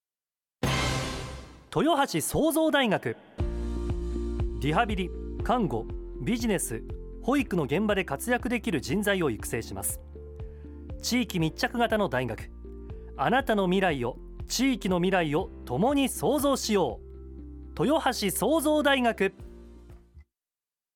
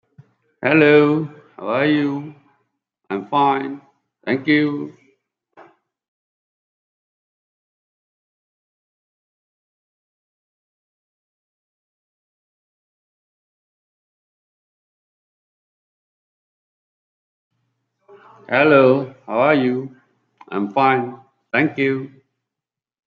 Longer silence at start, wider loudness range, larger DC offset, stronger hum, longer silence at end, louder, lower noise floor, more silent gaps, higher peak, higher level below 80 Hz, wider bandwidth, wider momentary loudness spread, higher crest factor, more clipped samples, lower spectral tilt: about the same, 0.6 s vs 0.6 s; second, 3 LU vs 7 LU; neither; neither; second, 0.75 s vs 1 s; second, -27 LUFS vs -18 LUFS; about the same, under -90 dBFS vs -87 dBFS; second, none vs 6.08-17.51 s; second, -12 dBFS vs -2 dBFS; first, -40 dBFS vs -72 dBFS; first, 18 kHz vs 5.2 kHz; about the same, 18 LU vs 19 LU; second, 16 dB vs 22 dB; neither; second, -4.5 dB/octave vs -8.5 dB/octave